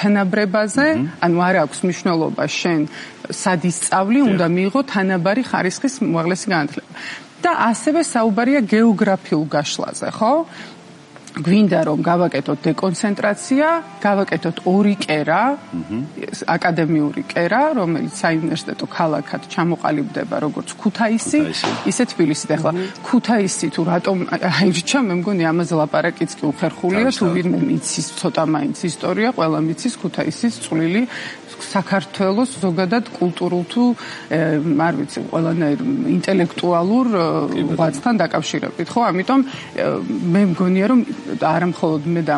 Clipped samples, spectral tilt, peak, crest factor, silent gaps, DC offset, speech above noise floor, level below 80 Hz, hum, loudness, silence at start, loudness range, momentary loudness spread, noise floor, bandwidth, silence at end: under 0.1%; -5.5 dB/octave; -2 dBFS; 16 dB; none; under 0.1%; 23 dB; -64 dBFS; none; -18 LUFS; 0 s; 2 LU; 7 LU; -41 dBFS; 11.5 kHz; 0 s